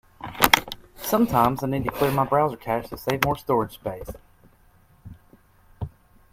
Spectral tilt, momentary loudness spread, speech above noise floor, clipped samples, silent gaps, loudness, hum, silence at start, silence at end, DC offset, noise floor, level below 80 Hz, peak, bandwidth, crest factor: -4.5 dB/octave; 19 LU; 33 dB; under 0.1%; none; -23 LUFS; none; 0.2 s; 0.45 s; under 0.1%; -57 dBFS; -46 dBFS; 0 dBFS; 16.5 kHz; 26 dB